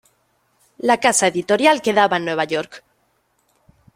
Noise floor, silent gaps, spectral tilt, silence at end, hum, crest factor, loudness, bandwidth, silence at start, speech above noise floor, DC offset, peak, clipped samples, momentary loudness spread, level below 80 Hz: -65 dBFS; none; -2.5 dB/octave; 1.15 s; none; 18 dB; -17 LUFS; 16 kHz; 0.85 s; 47 dB; under 0.1%; -2 dBFS; under 0.1%; 9 LU; -64 dBFS